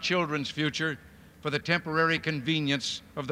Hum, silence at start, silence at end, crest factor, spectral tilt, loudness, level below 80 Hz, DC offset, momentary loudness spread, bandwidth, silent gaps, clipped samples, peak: none; 0 s; 0 s; 20 dB; -4.5 dB/octave; -29 LUFS; -62 dBFS; under 0.1%; 8 LU; 15.5 kHz; none; under 0.1%; -8 dBFS